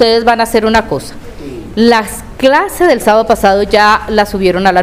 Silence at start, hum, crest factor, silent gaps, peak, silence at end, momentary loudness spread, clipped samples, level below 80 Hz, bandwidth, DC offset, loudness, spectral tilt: 0 s; none; 10 dB; none; 0 dBFS; 0 s; 14 LU; 0.6%; -32 dBFS; 16.5 kHz; 0.6%; -10 LUFS; -4.5 dB/octave